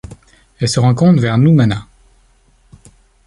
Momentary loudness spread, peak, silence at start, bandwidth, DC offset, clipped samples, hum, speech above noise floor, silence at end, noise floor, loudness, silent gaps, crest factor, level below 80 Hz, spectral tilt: 9 LU; -2 dBFS; 0.1 s; 11.5 kHz; under 0.1%; under 0.1%; none; 41 dB; 1.45 s; -52 dBFS; -13 LUFS; none; 14 dB; -44 dBFS; -6.5 dB/octave